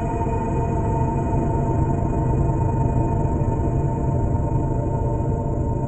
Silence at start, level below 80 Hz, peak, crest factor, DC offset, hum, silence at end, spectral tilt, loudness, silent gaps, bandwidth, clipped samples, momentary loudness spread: 0 s; -28 dBFS; -8 dBFS; 12 dB; under 0.1%; none; 0 s; -10.5 dB/octave; -22 LUFS; none; 8.4 kHz; under 0.1%; 2 LU